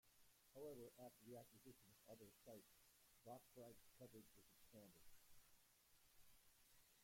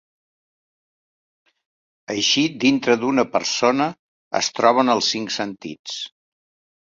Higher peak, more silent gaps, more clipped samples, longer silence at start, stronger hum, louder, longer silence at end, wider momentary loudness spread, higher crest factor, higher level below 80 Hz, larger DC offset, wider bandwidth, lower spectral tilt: second, -48 dBFS vs -2 dBFS; second, none vs 3.99-4.31 s, 5.79-5.84 s; neither; second, 0.05 s vs 2.1 s; neither; second, -64 LUFS vs -20 LUFS; second, 0 s vs 0.75 s; second, 9 LU vs 13 LU; about the same, 18 dB vs 20 dB; second, -84 dBFS vs -66 dBFS; neither; first, 16.5 kHz vs 7.8 kHz; first, -4.5 dB/octave vs -3 dB/octave